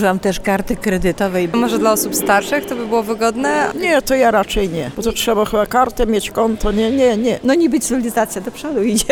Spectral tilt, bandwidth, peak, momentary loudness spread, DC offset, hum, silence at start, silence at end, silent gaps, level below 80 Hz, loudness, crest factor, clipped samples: -4 dB/octave; 19.5 kHz; 0 dBFS; 5 LU; under 0.1%; none; 0 s; 0 s; none; -32 dBFS; -16 LUFS; 16 dB; under 0.1%